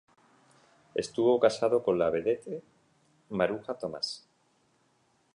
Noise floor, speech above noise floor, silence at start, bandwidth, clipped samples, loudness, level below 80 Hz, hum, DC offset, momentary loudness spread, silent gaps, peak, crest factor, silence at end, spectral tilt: -70 dBFS; 41 dB; 0.95 s; 11 kHz; under 0.1%; -29 LUFS; -68 dBFS; none; under 0.1%; 13 LU; none; -10 dBFS; 22 dB; 1.15 s; -5 dB/octave